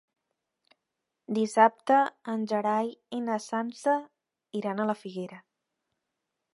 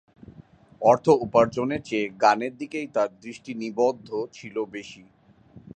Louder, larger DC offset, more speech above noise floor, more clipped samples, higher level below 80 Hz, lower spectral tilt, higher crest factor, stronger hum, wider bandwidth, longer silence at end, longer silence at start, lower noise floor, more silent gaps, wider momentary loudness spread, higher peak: second, -28 LUFS vs -24 LUFS; neither; first, 57 dB vs 28 dB; neither; second, -86 dBFS vs -60 dBFS; about the same, -5.5 dB/octave vs -6 dB/octave; about the same, 24 dB vs 20 dB; neither; first, 11.5 kHz vs 9.2 kHz; first, 1.15 s vs 0.15 s; first, 1.3 s vs 0.3 s; first, -85 dBFS vs -52 dBFS; neither; about the same, 12 LU vs 14 LU; about the same, -6 dBFS vs -4 dBFS